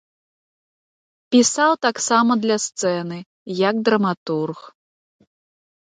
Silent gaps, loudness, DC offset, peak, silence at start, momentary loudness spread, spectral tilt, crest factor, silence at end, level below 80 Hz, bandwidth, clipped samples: 3.26-3.46 s, 4.17-4.26 s; -19 LUFS; under 0.1%; -2 dBFS; 1.3 s; 13 LU; -3.5 dB/octave; 18 dB; 1.15 s; -72 dBFS; 9.6 kHz; under 0.1%